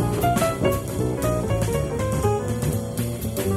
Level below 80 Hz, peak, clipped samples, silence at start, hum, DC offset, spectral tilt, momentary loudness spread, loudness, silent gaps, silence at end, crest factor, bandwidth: -36 dBFS; -8 dBFS; under 0.1%; 0 s; none; under 0.1%; -6 dB/octave; 5 LU; -24 LUFS; none; 0 s; 16 dB; 16 kHz